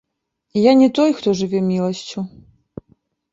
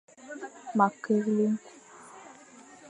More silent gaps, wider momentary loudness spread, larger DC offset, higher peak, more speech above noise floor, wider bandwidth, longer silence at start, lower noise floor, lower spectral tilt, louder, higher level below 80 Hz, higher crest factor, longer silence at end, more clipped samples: neither; second, 16 LU vs 24 LU; neither; first, 0 dBFS vs -8 dBFS; first, 57 dB vs 26 dB; second, 7.8 kHz vs 10.5 kHz; first, 0.55 s vs 0.2 s; first, -74 dBFS vs -52 dBFS; about the same, -6.5 dB/octave vs -7 dB/octave; first, -17 LUFS vs -28 LUFS; first, -58 dBFS vs -80 dBFS; about the same, 18 dB vs 22 dB; first, 1.05 s vs 0 s; neither